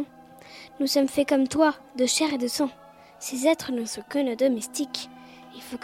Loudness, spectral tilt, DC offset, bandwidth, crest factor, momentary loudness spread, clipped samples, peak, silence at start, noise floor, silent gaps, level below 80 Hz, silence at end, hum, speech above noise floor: -25 LUFS; -2.5 dB/octave; under 0.1%; 16.5 kHz; 18 dB; 18 LU; under 0.1%; -8 dBFS; 0 s; -48 dBFS; none; -66 dBFS; 0 s; none; 23 dB